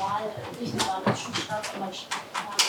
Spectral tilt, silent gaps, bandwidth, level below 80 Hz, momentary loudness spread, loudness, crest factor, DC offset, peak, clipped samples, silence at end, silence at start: -2.5 dB/octave; none; 19.5 kHz; -66 dBFS; 8 LU; -30 LUFS; 24 dB; under 0.1%; -6 dBFS; under 0.1%; 0 s; 0 s